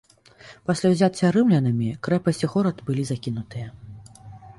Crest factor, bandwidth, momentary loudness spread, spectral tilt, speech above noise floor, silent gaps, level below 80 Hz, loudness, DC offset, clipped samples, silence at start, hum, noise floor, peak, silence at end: 16 dB; 11.5 kHz; 16 LU; -7 dB/octave; 27 dB; none; -56 dBFS; -23 LUFS; under 0.1%; under 0.1%; 0.45 s; none; -49 dBFS; -6 dBFS; 0.05 s